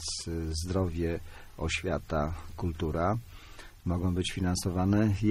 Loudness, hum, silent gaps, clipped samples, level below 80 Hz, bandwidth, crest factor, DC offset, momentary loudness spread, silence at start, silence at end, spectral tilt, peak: -31 LUFS; none; none; under 0.1%; -42 dBFS; 15.5 kHz; 16 dB; under 0.1%; 12 LU; 0 s; 0 s; -5.5 dB/octave; -14 dBFS